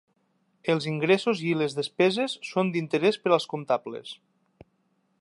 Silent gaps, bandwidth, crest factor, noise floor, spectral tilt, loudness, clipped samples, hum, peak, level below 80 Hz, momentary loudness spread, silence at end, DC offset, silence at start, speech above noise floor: none; 11.5 kHz; 20 dB; -71 dBFS; -5.5 dB/octave; -26 LUFS; under 0.1%; none; -8 dBFS; -74 dBFS; 12 LU; 1.05 s; under 0.1%; 0.65 s; 45 dB